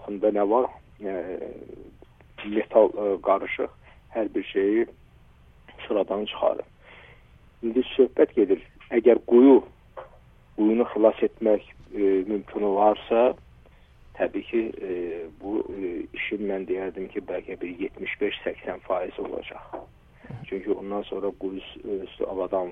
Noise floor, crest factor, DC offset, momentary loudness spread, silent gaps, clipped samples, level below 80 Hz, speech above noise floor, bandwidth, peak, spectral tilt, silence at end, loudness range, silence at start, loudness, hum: -53 dBFS; 20 dB; under 0.1%; 16 LU; none; under 0.1%; -56 dBFS; 29 dB; 3.8 kHz; -4 dBFS; -8.5 dB/octave; 0 s; 10 LU; 0 s; -25 LUFS; none